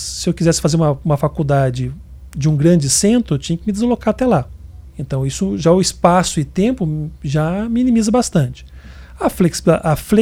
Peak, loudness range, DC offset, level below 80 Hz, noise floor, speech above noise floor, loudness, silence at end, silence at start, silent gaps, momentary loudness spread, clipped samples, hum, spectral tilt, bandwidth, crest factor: 0 dBFS; 2 LU; under 0.1%; -36 dBFS; -36 dBFS; 20 dB; -16 LUFS; 0 s; 0 s; none; 11 LU; under 0.1%; none; -5.5 dB/octave; 16.5 kHz; 16 dB